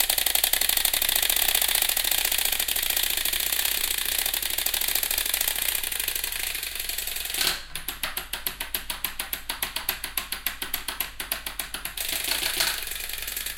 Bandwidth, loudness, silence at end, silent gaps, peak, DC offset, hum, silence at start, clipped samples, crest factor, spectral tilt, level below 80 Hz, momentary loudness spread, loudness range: 17.5 kHz; -24 LUFS; 0 s; none; -2 dBFS; under 0.1%; none; 0 s; under 0.1%; 24 dB; 1 dB/octave; -44 dBFS; 10 LU; 8 LU